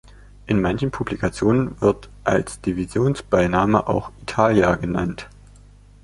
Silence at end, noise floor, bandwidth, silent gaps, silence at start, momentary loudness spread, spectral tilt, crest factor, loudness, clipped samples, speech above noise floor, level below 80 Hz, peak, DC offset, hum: 0.75 s; -47 dBFS; 11.5 kHz; none; 0.45 s; 8 LU; -7 dB/octave; 20 dB; -21 LUFS; under 0.1%; 27 dB; -40 dBFS; -2 dBFS; under 0.1%; 50 Hz at -40 dBFS